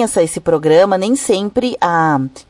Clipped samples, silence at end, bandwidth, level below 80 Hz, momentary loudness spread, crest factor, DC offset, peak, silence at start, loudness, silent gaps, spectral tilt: under 0.1%; 0.1 s; 11.5 kHz; -48 dBFS; 5 LU; 12 dB; under 0.1%; -2 dBFS; 0 s; -14 LUFS; none; -5 dB/octave